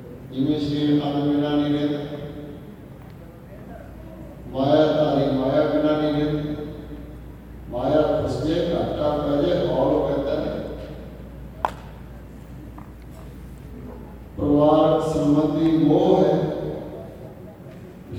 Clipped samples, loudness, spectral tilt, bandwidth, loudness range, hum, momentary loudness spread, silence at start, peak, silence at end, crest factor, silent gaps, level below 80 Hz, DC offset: under 0.1%; -21 LUFS; -8 dB/octave; 12 kHz; 11 LU; none; 23 LU; 0 s; -4 dBFS; 0 s; 18 dB; none; -42 dBFS; under 0.1%